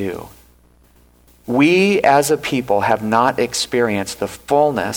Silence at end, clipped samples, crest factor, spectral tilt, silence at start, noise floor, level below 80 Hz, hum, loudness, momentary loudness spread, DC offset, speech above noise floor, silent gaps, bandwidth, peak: 0 s; under 0.1%; 16 dB; -4.5 dB/octave; 0 s; -51 dBFS; -50 dBFS; 60 Hz at -45 dBFS; -16 LUFS; 12 LU; under 0.1%; 35 dB; none; over 20 kHz; -2 dBFS